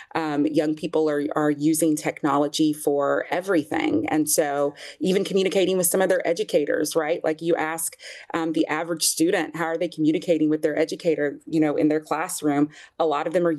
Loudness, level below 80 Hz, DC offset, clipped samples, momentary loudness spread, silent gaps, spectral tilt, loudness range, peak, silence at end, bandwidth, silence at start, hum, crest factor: -23 LUFS; -74 dBFS; under 0.1%; under 0.1%; 5 LU; none; -4 dB/octave; 2 LU; -8 dBFS; 0 s; 13 kHz; 0 s; none; 14 dB